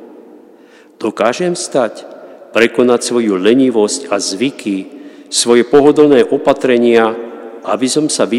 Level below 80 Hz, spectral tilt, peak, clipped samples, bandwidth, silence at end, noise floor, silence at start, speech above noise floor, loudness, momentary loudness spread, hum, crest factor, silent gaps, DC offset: -58 dBFS; -3.5 dB/octave; 0 dBFS; 0.2%; 13 kHz; 0 s; -42 dBFS; 0 s; 31 dB; -12 LUFS; 13 LU; none; 14 dB; none; under 0.1%